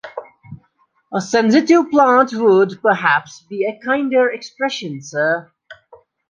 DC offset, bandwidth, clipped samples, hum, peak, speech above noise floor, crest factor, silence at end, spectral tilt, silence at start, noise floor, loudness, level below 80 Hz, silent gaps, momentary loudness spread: under 0.1%; 9.4 kHz; under 0.1%; none; -2 dBFS; 46 dB; 16 dB; 0.55 s; -5 dB/octave; 0.05 s; -61 dBFS; -16 LUFS; -64 dBFS; none; 13 LU